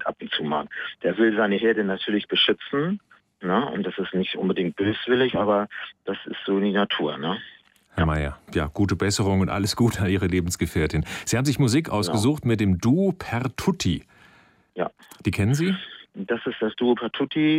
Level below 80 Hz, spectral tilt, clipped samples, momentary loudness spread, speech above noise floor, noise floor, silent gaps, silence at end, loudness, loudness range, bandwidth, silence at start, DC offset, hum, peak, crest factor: -44 dBFS; -5.5 dB/octave; under 0.1%; 10 LU; 33 dB; -56 dBFS; none; 0 s; -24 LUFS; 4 LU; 16 kHz; 0 s; under 0.1%; none; -8 dBFS; 16 dB